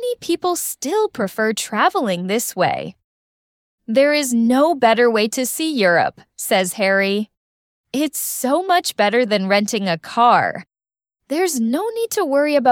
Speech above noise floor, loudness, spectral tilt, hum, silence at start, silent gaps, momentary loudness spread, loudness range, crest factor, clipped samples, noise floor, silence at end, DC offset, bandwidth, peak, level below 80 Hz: over 72 dB; -18 LUFS; -3.5 dB/octave; none; 0 s; 3.04-3.78 s, 7.37-7.84 s; 8 LU; 3 LU; 16 dB; under 0.1%; under -90 dBFS; 0 s; under 0.1%; 18 kHz; -2 dBFS; -66 dBFS